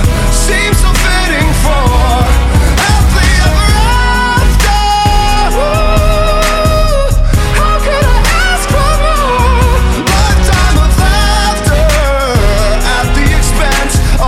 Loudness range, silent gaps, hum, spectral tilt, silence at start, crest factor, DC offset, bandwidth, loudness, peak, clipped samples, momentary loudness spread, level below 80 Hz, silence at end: 1 LU; none; none; -4.5 dB/octave; 0 s; 8 dB; under 0.1%; 15.5 kHz; -10 LUFS; 0 dBFS; under 0.1%; 2 LU; -10 dBFS; 0 s